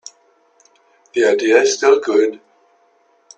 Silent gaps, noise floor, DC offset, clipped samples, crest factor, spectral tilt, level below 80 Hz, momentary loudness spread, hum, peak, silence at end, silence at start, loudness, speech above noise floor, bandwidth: none; -57 dBFS; under 0.1%; under 0.1%; 18 dB; -2 dB/octave; -68 dBFS; 7 LU; none; 0 dBFS; 1 s; 1.15 s; -15 LUFS; 43 dB; 9 kHz